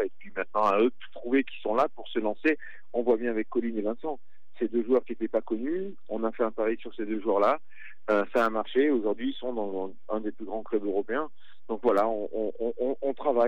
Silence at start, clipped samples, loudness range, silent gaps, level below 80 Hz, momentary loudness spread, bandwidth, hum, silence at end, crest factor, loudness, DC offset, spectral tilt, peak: 0 s; under 0.1%; 3 LU; none; -84 dBFS; 10 LU; 9.2 kHz; none; 0 s; 16 dB; -29 LUFS; 2%; -6.5 dB/octave; -12 dBFS